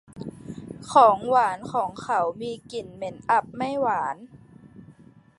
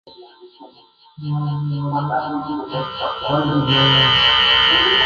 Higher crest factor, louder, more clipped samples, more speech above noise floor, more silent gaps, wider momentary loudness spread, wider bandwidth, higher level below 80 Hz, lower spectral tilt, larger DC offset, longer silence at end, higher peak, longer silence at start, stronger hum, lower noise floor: first, 22 dB vs 16 dB; second, -23 LUFS vs -16 LUFS; neither; about the same, 28 dB vs 25 dB; neither; first, 22 LU vs 14 LU; first, 11.5 kHz vs 7.2 kHz; second, -62 dBFS vs -44 dBFS; about the same, -5 dB/octave vs -5.5 dB/octave; neither; first, 0.55 s vs 0 s; about the same, -4 dBFS vs -2 dBFS; about the same, 0.15 s vs 0.05 s; neither; first, -52 dBFS vs -43 dBFS